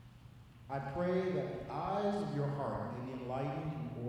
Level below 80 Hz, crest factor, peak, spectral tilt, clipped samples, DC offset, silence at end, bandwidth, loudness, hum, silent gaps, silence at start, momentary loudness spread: -62 dBFS; 14 dB; -24 dBFS; -8 dB/octave; under 0.1%; under 0.1%; 0 s; 11.5 kHz; -38 LUFS; none; none; 0 s; 14 LU